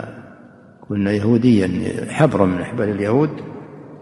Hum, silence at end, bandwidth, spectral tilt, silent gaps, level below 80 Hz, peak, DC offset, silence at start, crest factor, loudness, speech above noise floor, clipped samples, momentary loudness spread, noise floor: none; 0 s; 11.5 kHz; -8 dB/octave; none; -52 dBFS; 0 dBFS; under 0.1%; 0 s; 18 dB; -18 LUFS; 27 dB; under 0.1%; 19 LU; -44 dBFS